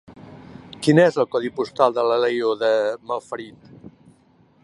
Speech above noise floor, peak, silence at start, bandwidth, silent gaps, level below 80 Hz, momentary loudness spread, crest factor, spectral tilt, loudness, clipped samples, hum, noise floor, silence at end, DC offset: 37 dB; -2 dBFS; 0.1 s; 11.5 kHz; none; -64 dBFS; 18 LU; 20 dB; -6 dB/octave; -20 LUFS; under 0.1%; none; -56 dBFS; 1.15 s; under 0.1%